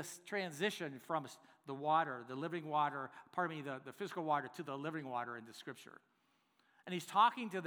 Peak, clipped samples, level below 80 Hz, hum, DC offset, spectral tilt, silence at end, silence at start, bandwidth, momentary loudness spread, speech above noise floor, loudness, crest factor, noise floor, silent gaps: -18 dBFS; under 0.1%; under -90 dBFS; none; under 0.1%; -4.5 dB/octave; 0 s; 0 s; over 20 kHz; 17 LU; 37 dB; -39 LUFS; 22 dB; -77 dBFS; none